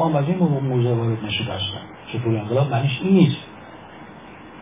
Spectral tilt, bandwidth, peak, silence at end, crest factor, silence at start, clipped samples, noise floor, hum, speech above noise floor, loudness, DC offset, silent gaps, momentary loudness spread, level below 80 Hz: -11.5 dB/octave; 3.9 kHz; -2 dBFS; 0 s; 18 dB; 0 s; under 0.1%; -41 dBFS; none; 21 dB; -21 LUFS; 0.1%; none; 24 LU; -50 dBFS